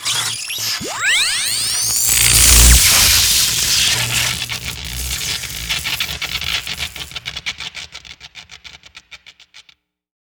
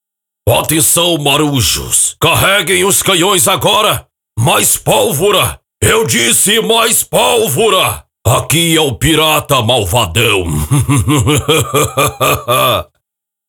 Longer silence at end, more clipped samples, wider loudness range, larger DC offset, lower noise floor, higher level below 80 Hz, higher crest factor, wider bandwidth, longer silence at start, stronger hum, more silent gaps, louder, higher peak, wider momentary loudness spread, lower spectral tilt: about the same, 0.75 s vs 0.65 s; neither; first, 17 LU vs 2 LU; neither; second, -54 dBFS vs -76 dBFS; first, -26 dBFS vs -34 dBFS; first, 18 dB vs 12 dB; about the same, over 20 kHz vs over 20 kHz; second, 0 s vs 0.45 s; neither; neither; second, -13 LUFS vs -10 LUFS; about the same, 0 dBFS vs 0 dBFS; first, 17 LU vs 5 LU; second, -0.5 dB/octave vs -3 dB/octave